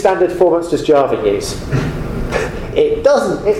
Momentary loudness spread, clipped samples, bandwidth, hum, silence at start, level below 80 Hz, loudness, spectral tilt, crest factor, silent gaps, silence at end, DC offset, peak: 7 LU; under 0.1%; 15.5 kHz; none; 0 s; -30 dBFS; -15 LUFS; -6 dB/octave; 14 dB; none; 0 s; under 0.1%; 0 dBFS